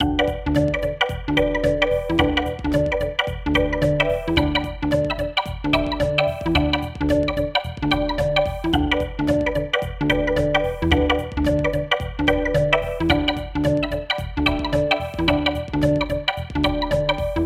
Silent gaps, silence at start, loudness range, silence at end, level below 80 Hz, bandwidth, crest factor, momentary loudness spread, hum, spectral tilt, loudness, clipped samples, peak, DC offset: none; 0 s; 1 LU; 0 s; -32 dBFS; 16 kHz; 20 dB; 4 LU; none; -6.5 dB/octave; -21 LUFS; under 0.1%; 0 dBFS; under 0.1%